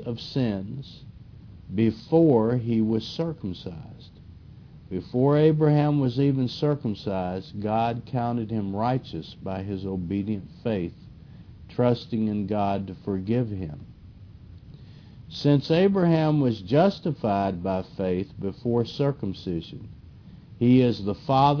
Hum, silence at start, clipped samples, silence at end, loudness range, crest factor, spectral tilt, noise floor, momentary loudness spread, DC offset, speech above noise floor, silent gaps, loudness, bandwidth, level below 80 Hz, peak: none; 0 s; under 0.1%; 0 s; 6 LU; 18 dB; -9 dB/octave; -46 dBFS; 15 LU; under 0.1%; 22 dB; none; -25 LUFS; 5.4 kHz; -54 dBFS; -6 dBFS